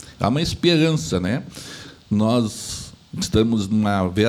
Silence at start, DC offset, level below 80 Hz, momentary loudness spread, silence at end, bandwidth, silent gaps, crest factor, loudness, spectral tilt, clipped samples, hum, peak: 0 s; under 0.1%; -44 dBFS; 16 LU; 0 s; 15.5 kHz; none; 16 dB; -21 LUFS; -5.5 dB/octave; under 0.1%; none; -4 dBFS